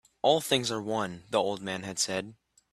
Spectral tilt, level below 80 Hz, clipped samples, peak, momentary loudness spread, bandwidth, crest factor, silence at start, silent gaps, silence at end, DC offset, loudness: -3 dB/octave; -68 dBFS; under 0.1%; -10 dBFS; 9 LU; 15.5 kHz; 22 dB; 0.25 s; none; 0.4 s; under 0.1%; -29 LUFS